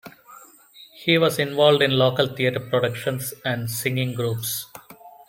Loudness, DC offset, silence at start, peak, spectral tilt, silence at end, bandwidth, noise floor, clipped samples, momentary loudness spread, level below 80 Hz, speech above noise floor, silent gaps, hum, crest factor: -22 LUFS; under 0.1%; 0.05 s; -2 dBFS; -4.5 dB/octave; 0.05 s; 17 kHz; -49 dBFS; under 0.1%; 10 LU; -62 dBFS; 28 dB; none; none; 20 dB